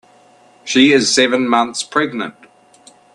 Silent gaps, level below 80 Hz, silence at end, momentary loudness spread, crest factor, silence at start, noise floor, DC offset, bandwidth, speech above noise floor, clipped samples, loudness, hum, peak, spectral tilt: none; -60 dBFS; 0.85 s; 15 LU; 16 dB; 0.65 s; -48 dBFS; under 0.1%; 11 kHz; 34 dB; under 0.1%; -14 LUFS; none; 0 dBFS; -2.5 dB/octave